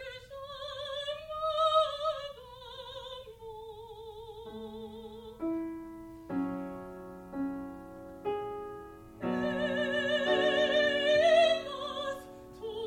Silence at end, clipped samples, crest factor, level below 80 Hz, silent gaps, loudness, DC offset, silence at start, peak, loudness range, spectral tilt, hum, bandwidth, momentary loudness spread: 0 s; under 0.1%; 18 dB; -62 dBFS; none; -31 LUFS; under 0.1%; 0 s; -14 dBFS; 14 LU; -4.5 dB/octave; none; 15.5 kHz; 20 LU